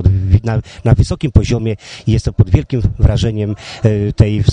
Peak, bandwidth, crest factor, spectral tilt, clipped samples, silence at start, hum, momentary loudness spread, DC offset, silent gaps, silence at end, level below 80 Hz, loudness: 0 dBFS; 9.6 kHz; 12 dB; -7.5 dB/octave; 0.3%; 0 s; none; 6 LU; under 0.1%; none; 0 s; -20 dBFS; -15 LUFS